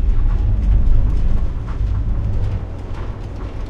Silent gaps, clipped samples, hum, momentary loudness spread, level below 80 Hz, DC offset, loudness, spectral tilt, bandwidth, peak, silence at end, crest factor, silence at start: none; under 0.1%; none; 11 LU; -16 dBFS; under 0.1%; -22 LUFS; -9 dB/octave; 3.9 kHz; -2 dBFS; 0 s; 14 dB; 0 s